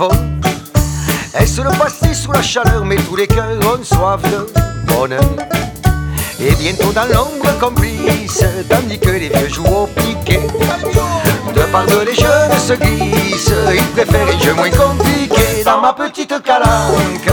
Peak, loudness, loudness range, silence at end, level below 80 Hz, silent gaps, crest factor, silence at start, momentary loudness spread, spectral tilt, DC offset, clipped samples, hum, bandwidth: 0 dBFS; -13 LUFS; 3 LU; 0 s; -22 dBFS; none; 12 dB; 0 s; 5 LU; -5 dB/octave; 0.1%; under 0.1%; none; over 20 kHz